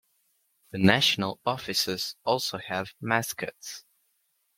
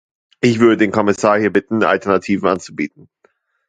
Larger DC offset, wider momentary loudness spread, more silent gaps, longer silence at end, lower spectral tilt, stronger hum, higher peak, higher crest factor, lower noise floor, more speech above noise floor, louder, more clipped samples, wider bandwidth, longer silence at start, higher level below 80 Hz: neither; first, 17 LU vs 10 LU; neither; about the same, 0.8 s vs 0.8 s; second, -3.5 dB/octave vs -6 dB/octave; neither; second, -4 dBFS vs 0 dBFS; first, 26 dB vs 16 dB; first, -73 dBFS vs -59 dBFS; about the same, 46 dB vs 44 dB; second, -27 LUFS vs -16 LUFS; neither; first, 16.5 kHz vs 9.4 kHz; first, 0.75 s vs 0.45 s; second, -66 dBFS vs -52 dBFS